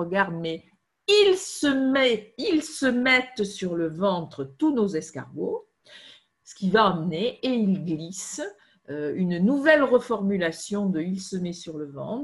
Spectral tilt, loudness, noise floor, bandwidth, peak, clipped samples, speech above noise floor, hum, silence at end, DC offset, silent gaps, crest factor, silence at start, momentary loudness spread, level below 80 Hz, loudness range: -5 dB/octave; -24 LUFS; -52 dBFS; 12 kHz; -4 dBFS; under 0.1%; 28 dB; none; 0 s; under 0.1%; none; 20 dB; 0 s; 14 LU; -64 dBFS; 4 LU